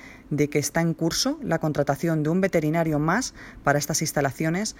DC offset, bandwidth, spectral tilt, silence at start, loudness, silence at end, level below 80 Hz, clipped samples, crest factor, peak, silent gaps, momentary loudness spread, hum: under 0.1%; 16.5 kHz; -5 dB/octave; 0 s; -24 LUFS; 0 s; -50 dBFS; under 0.1%; 18 dB; -6 dBFS; none; 4 LU; none